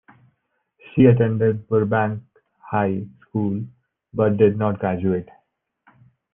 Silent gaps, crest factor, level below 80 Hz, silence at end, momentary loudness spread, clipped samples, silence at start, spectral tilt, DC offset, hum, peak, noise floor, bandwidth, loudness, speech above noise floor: none; 20 dB; -58 dBFS; 1.1 s; 14 LU; under 0.1%; 0.95 s; -12 dB/octave; under 0.1%; none; -2 dBFS; -71 dBFS; 3.6 kHz; -21 LUFS; 52 dB